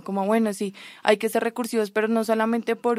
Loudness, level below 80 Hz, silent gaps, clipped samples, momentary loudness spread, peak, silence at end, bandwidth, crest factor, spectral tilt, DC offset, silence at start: -24 LUFS; -76 dBFS; none; under 0.1%; 5 LU; -2 dBFS; 0 s; 16 kHz; 22 dB; -5 dB/octave; under 0.1%; 0.05 s